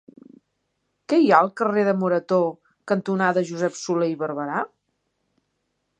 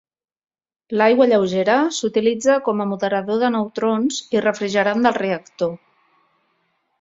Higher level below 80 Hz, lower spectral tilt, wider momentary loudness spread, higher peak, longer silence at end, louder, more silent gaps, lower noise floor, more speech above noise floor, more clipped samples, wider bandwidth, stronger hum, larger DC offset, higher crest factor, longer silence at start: second, -74 dBFS vs -64 dBFS; first, -6 dB/octave vs -4.5 dB/octave; about the same, 10 LU vs 9 LU; about the same, -2 dBFS vs -2 dBFS; about the same, 1.35 s vs 1.25 s; second, -22 LUFS vs -19 LUFS; neither; first, -75 dBFS vs -68 dBFS; first, 54 dB vs 50 dB; neither; first, 9.6 kHz vs 8 kHz; neither; neither; about the same, 22 dB vs 18 dB; first, 1.1 s vs 0.9 s